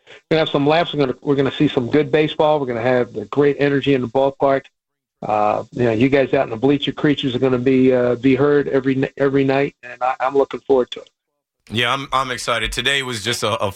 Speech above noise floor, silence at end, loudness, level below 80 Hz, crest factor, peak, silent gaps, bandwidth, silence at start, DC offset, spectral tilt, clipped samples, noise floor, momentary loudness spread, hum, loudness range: 58 dB; 0 s; -18 LUFS; -46 dBFS; 14 dB; -4 dBFS; none; 14.5 kHz; 0.1 s; under 0.1%; -5.5 dB/octave; under 0.1%; -76 dBFS; 5 LU; none; 3 LU